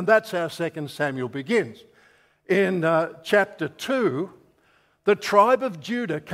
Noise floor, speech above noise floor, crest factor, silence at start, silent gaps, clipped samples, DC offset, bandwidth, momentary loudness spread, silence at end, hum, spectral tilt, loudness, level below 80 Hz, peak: -62 dBFS; 40 dB; 20 dB; 0 s; none; under 0.1%; under 0.1%; 16 kHz; 11 LU; 0 s; none; -5.5 dB/octave; -23 LUFS; -70 dBFS; -4 dBFS